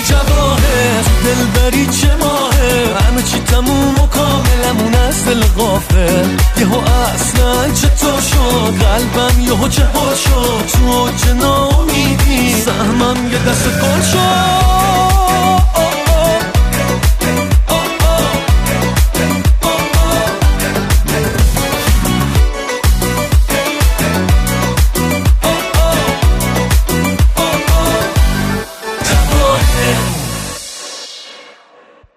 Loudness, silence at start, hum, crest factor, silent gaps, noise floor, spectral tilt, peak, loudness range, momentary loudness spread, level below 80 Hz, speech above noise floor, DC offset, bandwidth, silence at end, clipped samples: -12 LUFS; 0 s; none; 12 dB; none; -43 dBFS; -4.5 dB/octave; 0 dBFS; 2 LU; 3 LU; -16 dBFS; 33 dB; under 0.1%; 15.5 kHz; 0.65 s; under 0.1%